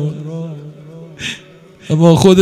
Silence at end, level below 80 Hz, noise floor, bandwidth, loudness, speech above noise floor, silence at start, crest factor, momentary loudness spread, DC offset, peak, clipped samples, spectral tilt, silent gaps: 0 s; -44 dBFS; -40 dBFS; 15 kHz; -14 LUFS; 28 dB; 0 s; 14 dB; 26 LU; under 0.1%; 0 dBFS; 0.3%; -6.5 dB/octave; none